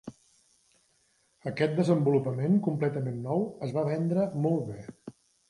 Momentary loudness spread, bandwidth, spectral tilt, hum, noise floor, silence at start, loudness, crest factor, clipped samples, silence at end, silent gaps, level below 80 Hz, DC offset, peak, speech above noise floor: 18 LU; 11.5 kHz; -8.5 dB/octave; none; -69 dBFS; 0.05 s; -29 LUFS; 18 dB; under 0.1%; 0.4 s; none; -68 dBFS; under 0.1%; -12 dBFS; 42 dB